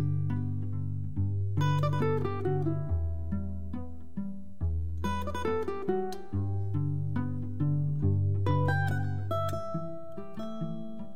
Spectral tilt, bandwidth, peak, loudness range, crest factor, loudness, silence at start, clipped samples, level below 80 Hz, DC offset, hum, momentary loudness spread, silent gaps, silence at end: -8.5 dB/octave; 8.8 kHz; -16 dBFS; 4 LU; 14 dB; -32 LUFS; 0 s; under 0.1%; -46 dBFS; 1%; none; 12 LU; none; 0 s